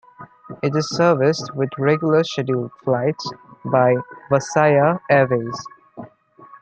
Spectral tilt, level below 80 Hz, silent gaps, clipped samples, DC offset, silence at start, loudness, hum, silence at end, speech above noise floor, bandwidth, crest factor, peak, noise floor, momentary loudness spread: -6 dB/octave; -62 dBFS; none; under 0.1%; under 0.1%; 0.2 s; -19 LUFS; none; 0.05 s; 28 dB; 8.8 kHz; 18 dB; -2 dBFS; -46 dBFS; 17 LU